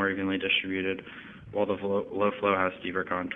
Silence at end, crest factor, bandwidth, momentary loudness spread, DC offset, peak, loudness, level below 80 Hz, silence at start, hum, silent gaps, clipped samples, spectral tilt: 0 s; 20 dB; 3.9 kHz; 11 LU; under 0.1%; -8 dBFS; -29 LUFS; -64 dBFS; 0 s; none; none; under 0.1%; -7.5 dB/octave